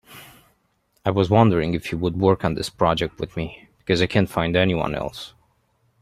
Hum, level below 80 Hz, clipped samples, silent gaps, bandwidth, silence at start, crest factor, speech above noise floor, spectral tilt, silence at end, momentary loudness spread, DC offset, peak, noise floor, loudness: none; -46 dBFS; under 0.1%; none; 15 kHz; 0.1 s; 20 dB; 46 dB; -6.5 dB/octave; 0.75 s; 14 LU; under 0.1%; -2 dBFS; -67 dBFS; -21 LUFS